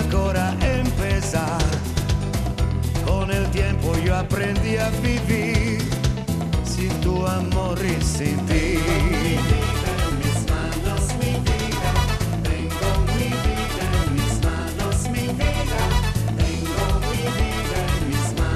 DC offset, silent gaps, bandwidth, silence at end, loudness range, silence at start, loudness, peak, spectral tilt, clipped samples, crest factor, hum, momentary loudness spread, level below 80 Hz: under 0.1%; none; 14 kHz; 0 s; 1 LU; 0 s; -22 LUFS; -6 dBFS; -5.5 dB/octave; under 0.1%; 16 dB; none; 3 LU; -26 dBFS